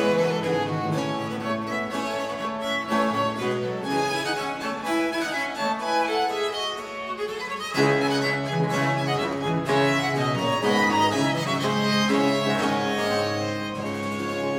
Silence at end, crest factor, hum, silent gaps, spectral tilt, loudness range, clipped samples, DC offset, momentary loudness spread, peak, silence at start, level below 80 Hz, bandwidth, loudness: 0 s; 16 dB; none; none; -5 dB/octave; 4 LU; under 0.1%; under 0.1%; 7 LU; -8 dBFS; 0 s; -60 dBFS; 18 kHz; -25 LUFS